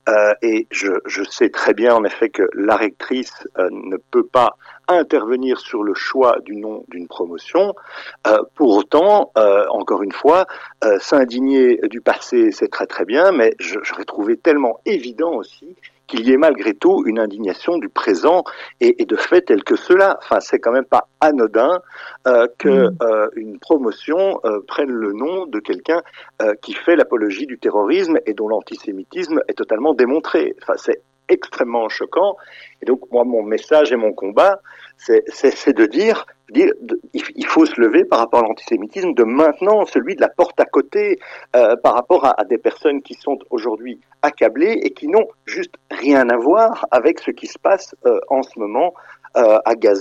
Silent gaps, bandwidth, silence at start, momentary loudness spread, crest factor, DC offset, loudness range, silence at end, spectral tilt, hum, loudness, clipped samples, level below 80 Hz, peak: none; 8 kHz; 0.05 s; 10 LU; 14 dB; under 0.1%; 4 LU; 0 s; -5 dB/octave; none; -16 LUFS; under 0.1%; -62 dBFS; -2 dBFS